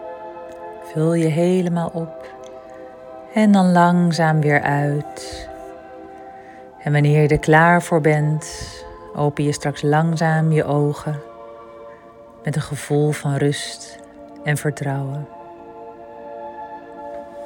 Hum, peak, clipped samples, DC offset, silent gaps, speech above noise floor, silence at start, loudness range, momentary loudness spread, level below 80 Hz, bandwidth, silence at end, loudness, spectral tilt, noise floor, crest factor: none; 0 dBFS; under 0.1%; under 0.1%; none; 25 dB; 0 s; 7 LU; 24 LU; -50 dBFS; 17 kHz; 0 s; -18 LUFS; -6.5 dB/octave; -43 dBFS; 20 dB